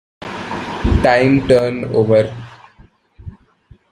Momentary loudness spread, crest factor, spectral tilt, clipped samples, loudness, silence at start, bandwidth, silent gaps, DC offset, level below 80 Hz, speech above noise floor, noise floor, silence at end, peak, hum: 15 LU; 16 dB; -7 dB/octave; under 0.1%; -15 LUFS; 0.2 s; 11 kHz; none; under 0.1%; -30 dBFS; 35 dB; -49 dBFS; 0.6 s; -2 dBFS; none